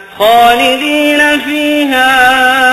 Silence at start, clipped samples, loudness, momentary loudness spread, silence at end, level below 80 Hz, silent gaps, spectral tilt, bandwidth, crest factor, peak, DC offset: 0 s; under 0.1%; -8 LUFS; 5 LU; 0 s; -42 dBFS; none; -2 dB/octave; 13.5 kHz; 8 dB; 0 dBFS; under 0.1%